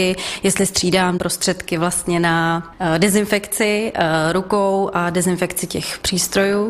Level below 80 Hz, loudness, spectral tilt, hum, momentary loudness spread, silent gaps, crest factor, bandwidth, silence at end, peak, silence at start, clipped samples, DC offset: -44 dBFS; -18 LUFS; -4 dB/octave; none; 5 LU; none; 16 dB; 16 kHz; 0 s; -2 dBFS; 0 s; under 0.1%; under 0.1%